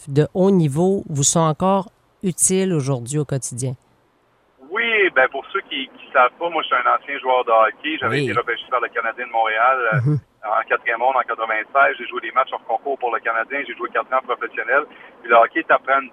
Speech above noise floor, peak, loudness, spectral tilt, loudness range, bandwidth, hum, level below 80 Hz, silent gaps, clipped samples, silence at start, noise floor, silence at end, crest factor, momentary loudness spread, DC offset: 41 dB; -2 dBFS; -19 LUFS; -4 dB/octave; 3 LU; 15.5 kHz; none; -60 dBFS; none; under 0.1%; 0 s; -60 dBFS; 0.05 s; 18 dB; 9 LU; under 0.1%